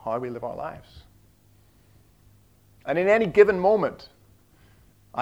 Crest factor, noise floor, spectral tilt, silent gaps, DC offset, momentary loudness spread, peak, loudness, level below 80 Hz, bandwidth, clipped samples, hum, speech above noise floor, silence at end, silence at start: 24 dB; -58 dBFS; -7 dB/octave; none; under 0.1%; 21 LU; -2 dBFS; -22 LUFS; -58 dBFS; 7.8 kHz; under 0.1%; none; 36 dB; 0 s; 0.05 s